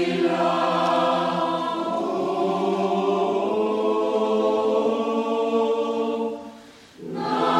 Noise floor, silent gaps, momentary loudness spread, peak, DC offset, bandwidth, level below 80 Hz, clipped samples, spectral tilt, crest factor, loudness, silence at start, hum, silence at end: -45 dBFS; none; 5 LU; -6 dBFS; under 0.1%; 11.5 kHz; -68 dBFS; under 0.1%; -6 dB/octave; 16 dB; -23 LUFS; 0 s; none; 0 s